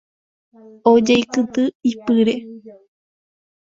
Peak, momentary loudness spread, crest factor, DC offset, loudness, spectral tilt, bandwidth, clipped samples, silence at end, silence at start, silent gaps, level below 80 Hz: 0 dBFS; 9 LU; 18 dB; under 0.1%; -17 LUFS; -5 dB/octave; 7.8 kHz; under 0.1%; 0.95 s; 0.85 s; 1.75-1.80 s; -60 dBFS